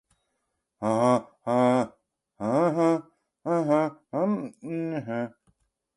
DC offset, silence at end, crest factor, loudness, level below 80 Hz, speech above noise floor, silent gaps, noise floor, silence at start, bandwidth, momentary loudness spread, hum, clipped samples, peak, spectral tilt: under 0.1%; 0.65 s; 18 dB; -26 LUFS; -72 dBFS; 55 dB; none; -79 dBFS; 0.8 s; 11.5 kHz; 11 LU; none; under 0.1%; -8 dBFS; -7.5 dB/octave